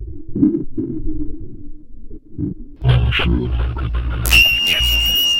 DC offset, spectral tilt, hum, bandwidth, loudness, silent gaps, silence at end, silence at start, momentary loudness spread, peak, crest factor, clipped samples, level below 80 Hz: under 0.1%; -4 dB/octave; none; 17 kHz; -16 LUFS; none; 0 s; 0 s; 18 LU; 0 dBFS; 18 dB; under 0.1%; -24 dBFS